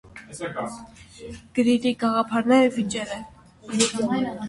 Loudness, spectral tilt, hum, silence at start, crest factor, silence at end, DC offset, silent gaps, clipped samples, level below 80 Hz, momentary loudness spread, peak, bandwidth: -23 LUFS; -4 dB/octave; none; 0.05 s; 20 dB; 0 s; under 0.1%; none; under 0.1%; -56 dBFS; 22 LU; -6 dBFS; 11.5 kHz